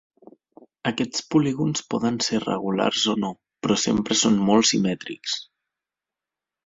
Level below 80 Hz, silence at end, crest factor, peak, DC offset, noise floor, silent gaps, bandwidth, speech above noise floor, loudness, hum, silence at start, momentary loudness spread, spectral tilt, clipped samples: -60 dBFS; 1.2 s; 18 dB; -6 dBFS; under 0.1%; -89 dBFS; none; 7.8 kHz; 66 dB; -23 LUFS; none; 0.85 s; 11 LU; -4 dB/octave; under 0.1%